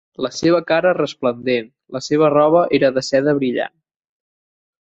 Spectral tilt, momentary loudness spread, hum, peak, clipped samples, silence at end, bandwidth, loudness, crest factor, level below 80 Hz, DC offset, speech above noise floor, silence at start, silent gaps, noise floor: -5.5 dB/octave; 11 LU; none; -2 dBFS; under 0.1%; 1.3 s; 8 kHz; -17 LUFS; 16 dB; -58 dBFS; under 0.1%; over 73 dB; 0.2 s; none; under -90 dBFS